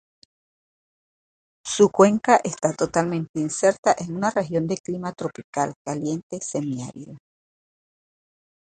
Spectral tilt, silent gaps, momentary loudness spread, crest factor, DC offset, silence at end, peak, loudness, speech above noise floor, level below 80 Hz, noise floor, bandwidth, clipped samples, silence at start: -5 dB/octave; 3.29-3.34 s, 3.78-3.83 s, 4.80-4.84 s, 5.44-5.53 s, 5.76-5.85 s, 6.23-6.30 s; 14 LU; 22 dB; under 0.1%; 1.55 s; -2 dBFS; -23 LUFS; over 68 dB; -62 dBFS; under -90 dBFS; 9.4 kHz; under 0.1%; 1.65 s